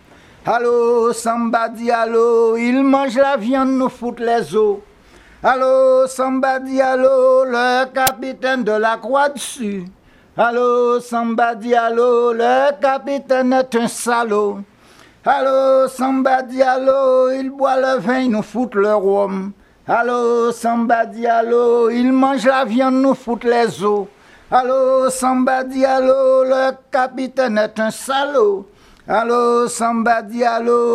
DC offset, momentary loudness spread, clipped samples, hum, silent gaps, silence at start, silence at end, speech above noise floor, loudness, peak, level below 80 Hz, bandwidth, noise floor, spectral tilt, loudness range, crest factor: under 0.1%; 6 LU; under 0.1%; none; none; 0.45 s; 0 s; 31 dB; -16 LUFS; 0 dBFS; -56 dBFS; 16 kHz; -47 dBFS; -4.5 dB/octave; 2 LU; 14 dB